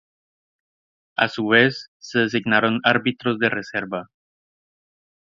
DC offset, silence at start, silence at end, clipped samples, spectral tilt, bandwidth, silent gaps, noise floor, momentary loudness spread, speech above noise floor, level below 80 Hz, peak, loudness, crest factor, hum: under 0.1%; 1.2 s; 1.35 s; under 0.1%; -5.5 dB/octave; 7.4 kHz; 1.88-2.00 s; under -90 dBFS; 14 LU; over 69 dB; -64 dBFS; 0 dBFS; -20 LUFS; 24 dB; none